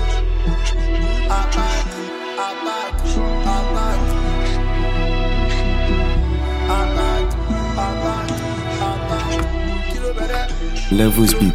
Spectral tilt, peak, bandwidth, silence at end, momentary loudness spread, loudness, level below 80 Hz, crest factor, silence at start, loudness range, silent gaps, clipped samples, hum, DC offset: -5.5 dB/octave; -2 dBFS; 16 kHz; 0 s; 5 LU; -20 LUFS; -18 dBFS; 16 dB; 0 s; 2 LU; none; under 0.1%; none; under 0.1%